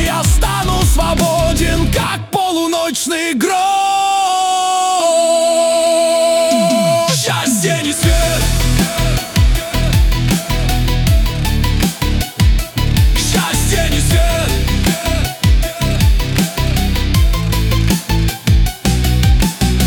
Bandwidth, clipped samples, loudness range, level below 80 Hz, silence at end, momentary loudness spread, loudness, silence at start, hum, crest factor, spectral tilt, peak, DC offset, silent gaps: 19 kHz; under 0.1%; 3 LU; -18 dBFS; 0 s; 4 LU; -14 LUFS; 0 s; none; 12 dB; -4.5 dB/octave; -2 dBFS; under 0.1%; none